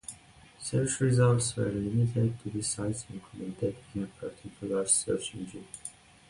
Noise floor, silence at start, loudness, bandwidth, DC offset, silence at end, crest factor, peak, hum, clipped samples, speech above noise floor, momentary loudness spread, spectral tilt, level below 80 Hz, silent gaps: -55 dBFS; 0.1 s; -30 LUFS; 11.5 kHz; under 0.1%; 0.4 s; 18 dB; -12 dBFS; none; under 0.1%; 25 dB; 17 LU; -5 dB/octave; -56 dBFS; none